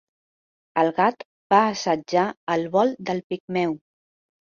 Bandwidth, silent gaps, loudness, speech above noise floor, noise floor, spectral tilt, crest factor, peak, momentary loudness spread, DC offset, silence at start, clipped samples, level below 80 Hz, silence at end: 7.4 kHz; 1.25-1.50 s, 2.37-2.47 s, 3.24-3.30 s, 3.40-3.48 s; -23 LUFS; over 68 dB; under -90 dBFS; -5.5 dB/octave; 20 dB; -4 dBFS; 10 LU; under 0.1%; 0.75 s; under 0.1%; -68 dBFS; 0.85 s